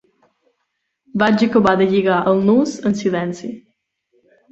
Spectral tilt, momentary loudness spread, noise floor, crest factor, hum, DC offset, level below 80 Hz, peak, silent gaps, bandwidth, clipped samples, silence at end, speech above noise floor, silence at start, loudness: -6.5 dB/octave; 14 LU; -73 dBFS; 16 dB; none; under 0.1%; -56 dBFS; -2 dBFS; none; 8 kHz; under 0.1%; 0.9 s; 57 dB; 1.15 s; -16 LUFS